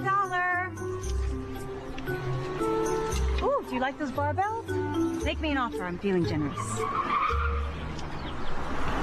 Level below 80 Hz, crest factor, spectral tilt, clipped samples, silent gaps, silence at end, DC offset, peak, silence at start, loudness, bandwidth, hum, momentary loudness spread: -36 dBFS; 12 dB; -5.5 dB/octave; under 0.1%; none; 0 s; under 0.1%; -18 dBFS; 0 s; -30 LUFS; 13.5 kHz; none; 10 LU